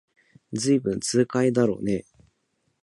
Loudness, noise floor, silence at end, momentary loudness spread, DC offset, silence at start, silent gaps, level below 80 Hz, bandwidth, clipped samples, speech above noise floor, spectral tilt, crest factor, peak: -24 LUFS; -73 dBFS; 0.85 s; 8 LU; under 0.1%; 0.5 s; none; -58 dBFS; 11.5 kHz; under 0.1%; 50 dB; -5.5 dB/octave; 18 dB; -8 dBFS